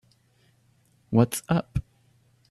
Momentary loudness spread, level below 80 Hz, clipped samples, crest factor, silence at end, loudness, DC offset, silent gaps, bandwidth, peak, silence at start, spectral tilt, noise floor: 11 LU; -48 dBFS; under 0.1%; 22 dB; 0.7 s; -26 LUFS; under 0.1%; none; 14.5 kHz; -6 dBFS; 1.1 s; -6.5 dB/octave; -64 dBFS